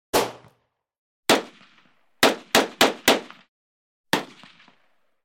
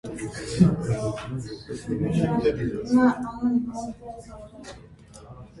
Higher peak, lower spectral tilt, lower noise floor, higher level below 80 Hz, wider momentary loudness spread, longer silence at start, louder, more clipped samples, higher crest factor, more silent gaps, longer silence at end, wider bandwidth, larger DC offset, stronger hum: about the same, -4 dBFS vs -6 dBFS; second, -2 dB/octave vs -7.5 dB/octave; first, -68 dBFS vs -46 dBFS; second, -64 dBFS vs -46 dBFS; second, 12 LU vs 22 LU; about the same, 0.15 s vs 0.05 s; first, -22 LUFS vs -25 LUFS; neither; about the same, 22 dB vs 20 dB; first, 0.98-1.23 s, 3.48-4.04 s vs none; first, 1 s vs 0 s; first, 17 kHz vs 11.5 kHz; neither; neither